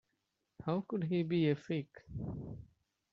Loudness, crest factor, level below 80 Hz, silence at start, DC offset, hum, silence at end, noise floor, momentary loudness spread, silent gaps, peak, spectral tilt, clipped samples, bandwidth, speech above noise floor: -37 LUFS; 18 dB; -62 dBFS; 0.6 s; under 0.1%; none; 0.45 s; -84 dBFS; 15 LU; none; -20 dBFS; -7 dB/octave; under 0.1%; 7 kHz; 48 dB